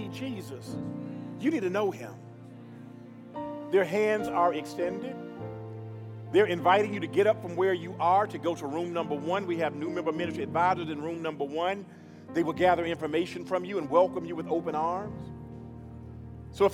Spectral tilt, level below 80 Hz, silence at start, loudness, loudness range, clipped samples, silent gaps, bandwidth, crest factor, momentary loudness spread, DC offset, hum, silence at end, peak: -6.5 dB/octave; -64 dBFS; 0 s; -29 LUFS; 4 LU; under 0.1%; none; 15.5 kHz; 20 dB; 19 LU; under 0.1%; none; 0 s; -10 dBFS